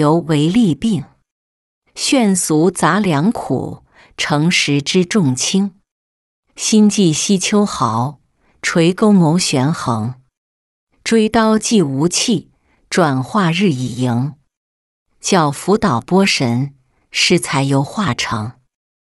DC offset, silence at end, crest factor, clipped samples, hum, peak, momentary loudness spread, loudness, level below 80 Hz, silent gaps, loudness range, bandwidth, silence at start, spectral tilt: under 0.1%; 0.55 s; 14 dB; under 0.1%; none; -2 dBFS; 9 LU; -15 LUFS; -50 dBFS; 1.32-1.82 s, 5.91-6.43 s, 10.37-10.87 s, 14.57-15.06 s; 2 LU; 12 kHz; 0 s; -4.5 dB/octave